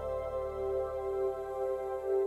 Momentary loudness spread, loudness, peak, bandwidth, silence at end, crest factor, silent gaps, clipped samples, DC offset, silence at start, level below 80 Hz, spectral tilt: 2 LU; -35 LUFS; -22 dBFS; 12.5 kHz; 0 s; 12 dB; none; under 0.1%; under 0.1%; 0 s; -52 dBFS; -7.5 dB/octave